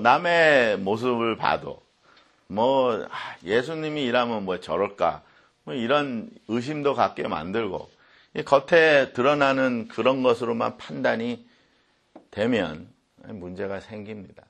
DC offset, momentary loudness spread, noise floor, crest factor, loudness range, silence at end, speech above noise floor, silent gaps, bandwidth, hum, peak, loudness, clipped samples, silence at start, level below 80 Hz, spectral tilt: under 0.1%; 18 LU; -65 dBFS; 22 dB; 6 LU; 0.25 s; 41 dB; none; 9.4 kHz; none; -2 dBFS; -23 LUFS; under 0.1%; 0 s; -62 dBFS; -5.5 dB/octave